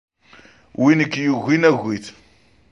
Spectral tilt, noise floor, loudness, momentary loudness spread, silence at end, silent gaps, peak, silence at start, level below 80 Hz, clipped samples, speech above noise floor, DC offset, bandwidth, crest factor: -6.5 dB/octave; -55 dBFS; -18 LUFS; 16 LU; 0.6 s; none; -2 dBFS; 0.8 s; -60 dBFS; under 0.1%; 38 dB; under 0.1%; 8 kHz; 18 dB